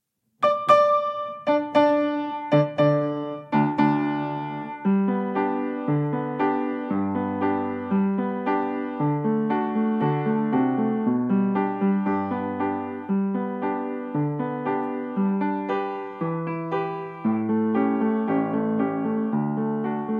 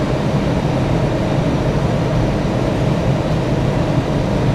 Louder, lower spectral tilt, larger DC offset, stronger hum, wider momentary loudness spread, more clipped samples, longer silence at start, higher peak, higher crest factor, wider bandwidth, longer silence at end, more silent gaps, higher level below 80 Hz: second, -24 LUFS vs -17 LUFS; first, -9 dB/octave vs -7.5 dB/octave; neither; neither; first, 7 LU vs 1 LU; neither; first, 0.4 s vs 0 s; about the same, -6 dBFS vs -4 dBFS; first, 18 dB vs 12 dB; second, 6.4 kHz vs 12.5 kHz; about the same, 0 s vs 0 s; neither; second, -74 dBFS vs -28 dBFS